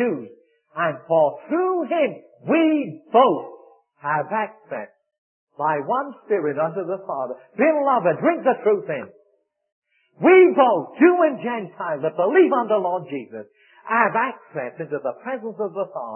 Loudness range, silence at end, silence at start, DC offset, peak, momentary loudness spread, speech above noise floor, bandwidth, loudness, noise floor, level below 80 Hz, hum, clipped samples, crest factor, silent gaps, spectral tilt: 8 LU; 0 s; 0 s; under 0.1%; -2 dBFS; 15 LU; 46 dB; 3.3 kHz; -21 LUFS; -66 dBFS; -82 dBFS; none; under 0.1%; 18 dB; 5.18-5.47 s, 9.72-9.82 s; -11 dB/octave